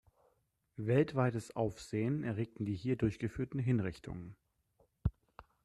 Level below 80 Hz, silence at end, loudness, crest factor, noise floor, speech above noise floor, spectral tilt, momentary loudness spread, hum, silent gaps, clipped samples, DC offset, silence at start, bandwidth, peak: -54 dBFS; 0.25 s; -36 LUFS; 20 dB; -77 dBFS; 42 dB; -8 dB/octave; 14 LU; none; none; under 0.1%; under 0.1%; 0.8 s; 12 kHz; -18 dBFS